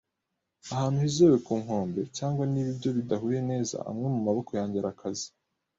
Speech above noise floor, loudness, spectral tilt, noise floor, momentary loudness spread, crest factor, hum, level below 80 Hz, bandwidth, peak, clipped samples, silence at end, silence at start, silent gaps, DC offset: 55 dB; -29 LUFS; -6.5 dB/octave; -83 dBFS; 13 LU; 18 dB; none; -62 dBFS; 8 kHz; -10 dBFS; under 0.1%; 0.5 s; 0.65 s; none; under 0.1%